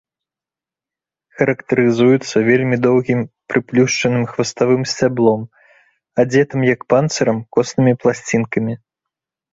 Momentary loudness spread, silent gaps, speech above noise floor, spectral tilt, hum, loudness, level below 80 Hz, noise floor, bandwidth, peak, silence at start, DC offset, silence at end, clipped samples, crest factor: 7 LU; none; 73 dB; -6 dB/octave; none; -16 LUFS; -54 dBFS; -89 dBFS; 8 kHz; -2 dBFS; 1.4 s; under 0.1%; 0.8 s; under 0.1%; 16 dB